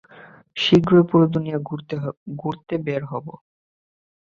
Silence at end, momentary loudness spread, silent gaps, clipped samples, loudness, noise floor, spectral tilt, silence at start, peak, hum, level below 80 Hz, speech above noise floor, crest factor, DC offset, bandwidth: 0.95 s; 17 LU; 2.17-2.26 s; under 0.1%; -21 LUFS; -47 dBFS; -7.5 dB/octave; 0.15 s; -2 dBFS; none; -56 dBFS; 27 dB; 20 dB; under 0.1%; 7.2 kHz